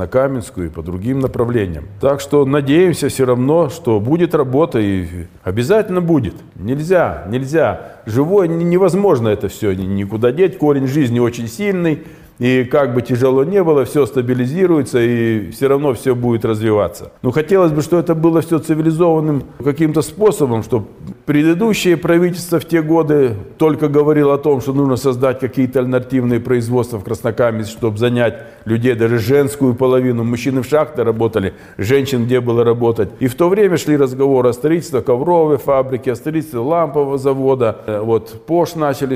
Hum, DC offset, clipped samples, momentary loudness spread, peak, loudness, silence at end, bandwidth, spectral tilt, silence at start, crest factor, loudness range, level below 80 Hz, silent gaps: none; under 0.1%; under 0.1%; 7 LU; -2 dBFS; -15 LUFS; 0 s; 16 kHz; -7 dB/octave; 0 s; 12 dB; 2 LU; -46 dBFS; none